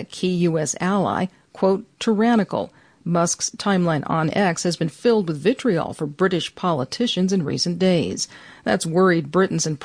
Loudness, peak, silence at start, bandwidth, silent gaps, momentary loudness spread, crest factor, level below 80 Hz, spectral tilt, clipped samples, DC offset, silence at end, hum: -21 LUFS; -6 dBFS; 0 s; 10.5 kHz; none; 8 LU; 14 dB; -58 dBFS; -5 dB/octave; under 0.1%; under 0.1%; 0 s; none